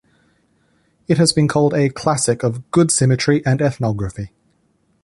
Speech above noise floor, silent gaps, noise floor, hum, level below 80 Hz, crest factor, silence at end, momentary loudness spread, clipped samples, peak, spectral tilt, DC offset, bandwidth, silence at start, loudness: 46 dB; none; -62 dBFS; none; -46 dBFS; 16 dB; 0.75 s; 12 LU; under 0.1%; -2 dBFS; -5 dB/octave; under 0.1%; 11.5 kHz; 1.1 s; -17 LUFS